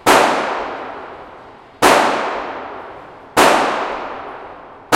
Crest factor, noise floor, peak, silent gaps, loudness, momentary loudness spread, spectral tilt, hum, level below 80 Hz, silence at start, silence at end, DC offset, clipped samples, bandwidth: 18 dB; -39 dBFS; 0 dBFS; none; -16 LUFS; 23 LU; -2.5 dB/octave; none; -50 dBFS; 0.05 s; 0 s; under 0.1%; under 0.1%; 17 kHz